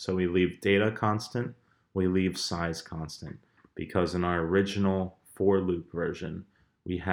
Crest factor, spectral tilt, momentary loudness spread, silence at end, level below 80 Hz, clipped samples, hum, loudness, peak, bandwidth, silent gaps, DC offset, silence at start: 20 dB; -6 dB/octave; 14 LU; 0 s; -54 dBFS; under 0.1%; none; -29 LUFS; -10 dBFS; 15.5 kHz; none; under 0.1%; 0 s